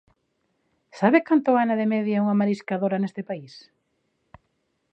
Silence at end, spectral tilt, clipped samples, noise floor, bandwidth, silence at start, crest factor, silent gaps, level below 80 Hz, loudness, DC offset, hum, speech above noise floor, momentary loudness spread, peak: 1.35 s; -8 dB/octave; under 0.1%; -73 dBFS; 8 kHz; 0.95 s; 20 dB; none; -72 dBFS; -22 LUFS; under 0.1%; none; 51 dB; 12 LU; -4 dBFS